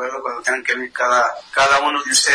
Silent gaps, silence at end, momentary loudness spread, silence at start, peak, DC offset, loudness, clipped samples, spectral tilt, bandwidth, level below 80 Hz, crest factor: none; 0 s; 7 LU; 0 s; -2 dBFS; under 0.1%; -17 LUFS; under 0.1%; 0.5 dB/octave; 10.5 kHz; -56 dBFS; 16 dB